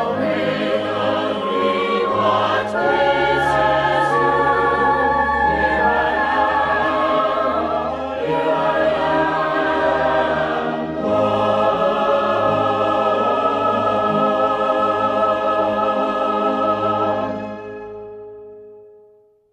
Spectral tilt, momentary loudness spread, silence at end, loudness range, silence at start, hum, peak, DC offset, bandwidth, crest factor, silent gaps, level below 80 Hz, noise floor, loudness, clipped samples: -6 dB/octave; 5 LU; 0.65 s; 3 LU; 0 s; none; -6 dBFS; under 0.1%; 11 kHz; 12 dB; none; -44 dBFS; -52 dBFS; -18 LUFS; under 0.1%